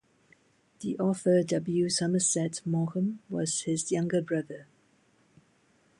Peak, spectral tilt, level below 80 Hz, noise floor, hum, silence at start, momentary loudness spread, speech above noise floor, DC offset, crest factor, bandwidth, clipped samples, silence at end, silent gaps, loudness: -14 dBFS; -5 dB/octave; -72 dBFS; -66 dBFS; none; 0.8 s; 8 LU; 38 dB; under 0.1%; 16 dB; 11.5 kHz; under 0.1%; 1.35 s; none; -29 LUFS